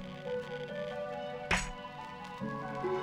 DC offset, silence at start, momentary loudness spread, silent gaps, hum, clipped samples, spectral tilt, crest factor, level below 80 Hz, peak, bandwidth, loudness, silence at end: under 0.1%; 0 s; 11 LU; none; none; under 0.1%; -4.5 dB/octave; 22 dB; -52 dBFS; -16 dBFS; 16 kHz; -38 LUFS; 0 s